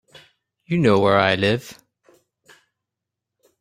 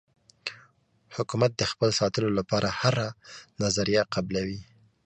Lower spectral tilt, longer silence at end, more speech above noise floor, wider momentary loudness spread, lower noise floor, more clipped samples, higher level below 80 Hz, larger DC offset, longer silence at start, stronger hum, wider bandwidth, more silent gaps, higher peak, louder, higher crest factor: first, -6.5 dB/octave vs -4.5 dB/octave; first, 1.9 s vs 0.4 s; first, 66 dB vs 36 dB; second, 11 LU vs 14 LU; first, -84 dBFS vs -62 dBFS; neither; about the same, -58 dBFS vs -54 dBFS; neither; first, 0.7 s vs 0.45 s; neither; first, 16 kHz vs 9.8 kHz; neither; first, -2 dBFS vs -6 dBFS; first, -18 LUFS vs -27 LUFS; about the same, 20 dB vs 22 dB